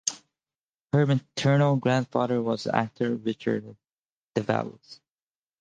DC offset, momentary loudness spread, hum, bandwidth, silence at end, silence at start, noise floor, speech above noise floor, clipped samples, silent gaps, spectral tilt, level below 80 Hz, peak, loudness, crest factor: under 0.1%; 9 LU; none; 10 kHz; 0.65 s; 0.05 s; under -90 dBFS; over 65 dB; under 0.1%; 0.60-0.86 s, 3.93-4.03 s, 4.12-4.31 s; -6 dB/octave; -68 dBFS; -4 dBFS; -26 LUFS; 22 dB